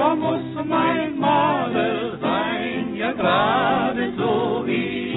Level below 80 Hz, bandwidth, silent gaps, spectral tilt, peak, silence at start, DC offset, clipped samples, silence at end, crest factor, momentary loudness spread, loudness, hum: -56 dBFS; 4.1 kHz; none; -10.5 dB/octave; -6 dBFS; 0 s; under 0.1%; under 0.1%; 0 s; 14 dB; 6 LU; -21 LUFS; none